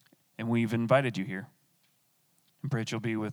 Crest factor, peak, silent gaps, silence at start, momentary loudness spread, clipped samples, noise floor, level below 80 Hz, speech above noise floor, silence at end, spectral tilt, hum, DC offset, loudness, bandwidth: 22 dB; -10 dBFS; none; 0.4 s; 16 LU; under 0.1%; -71 dBFS; -80 dBFS; 41 dB; 0 s; -6.5 dB/octave; none; under 0.1%; -31 LUFS; 18 kHz